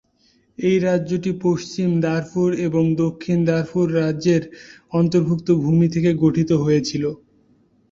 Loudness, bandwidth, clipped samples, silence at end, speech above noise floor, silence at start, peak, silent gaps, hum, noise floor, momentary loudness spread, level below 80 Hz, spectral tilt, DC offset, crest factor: -20 LUFS; 7.6 kHz; under 0.1%; 0.75 s; 41 dB; 0.6 s; -4 dBFS; none; none; -60 dBFS; 6 LU; -52 dBFS; -7.5 dB/octave; under 0.1%; 14 dB